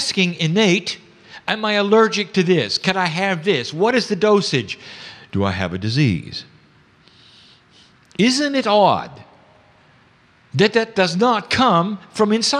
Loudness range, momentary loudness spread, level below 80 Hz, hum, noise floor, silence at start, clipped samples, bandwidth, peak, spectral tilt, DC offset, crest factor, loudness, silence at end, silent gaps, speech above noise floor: 5 LU; 14 LU; -56 dBFS; none; -53 dBFS; 0 s; under 0.1%; 11 kHz; -2 dBFS; -4.5 dB/octave; under 0.1%; 18 dB; -18 LUFS; 0 s; none; 36 dB